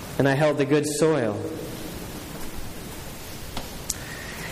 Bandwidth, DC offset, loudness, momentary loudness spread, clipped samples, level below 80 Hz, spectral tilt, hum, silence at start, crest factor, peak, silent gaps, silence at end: 15.5 kHz; under 0.1%; -26 LUFS; 16 LU; under 0.1%; -44 dBFS; -5 dB/octave; none; 0 s; 22 dB; -4 dBFS; none; 0 s